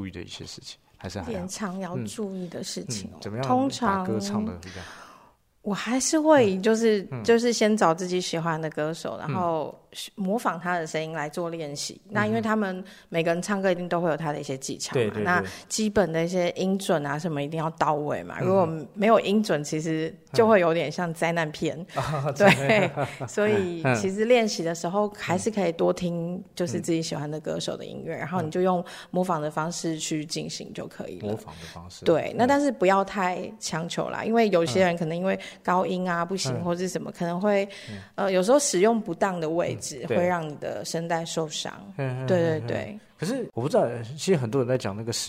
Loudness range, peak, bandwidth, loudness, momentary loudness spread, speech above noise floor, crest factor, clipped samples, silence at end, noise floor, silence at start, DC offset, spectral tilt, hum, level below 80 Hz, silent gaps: 6 LU; -4 dBFS; 16 kHz; -26 LUFS; 12 LU; 31 dB; 22 dB; under 0.1%; 0 s; -57 dBFS; 0 s; under 0.1%; -5 dB/octave; none; -60 dBFS; none